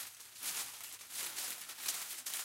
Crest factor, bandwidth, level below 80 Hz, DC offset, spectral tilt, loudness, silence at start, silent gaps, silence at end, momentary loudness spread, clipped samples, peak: 24 dB; 17 kHz; -88 dBFS; under 0.1%; 2.5 dB/octave; -40 LUFS; 0 s; none; 0 s; 5 LU; under 0.1%; -20 dBFS